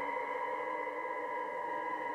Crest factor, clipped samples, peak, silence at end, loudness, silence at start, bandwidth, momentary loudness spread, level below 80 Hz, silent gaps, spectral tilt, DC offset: 12 dB; under 0.1%; -26 dBFS; 0 s; -38 LUFS; 0 s; 13 kHz; 1 LU; -84 dBFS; none; -4.5 dB/octave; under 0.1%